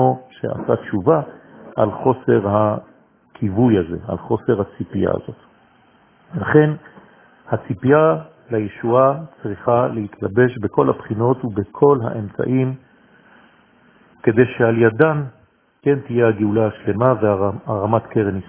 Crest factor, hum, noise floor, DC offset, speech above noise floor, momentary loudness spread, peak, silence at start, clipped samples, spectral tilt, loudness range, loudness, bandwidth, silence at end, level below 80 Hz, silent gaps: 18 dB; none; -54 dBFS; under 0.1%; 36 dB; 11 LU; 0 dBFS; 0 s; under 0.1%; -12 dB/octave; 3 LU; -18 LUFS; 3.5 kHz; 0.05 s; -48 dBFS; none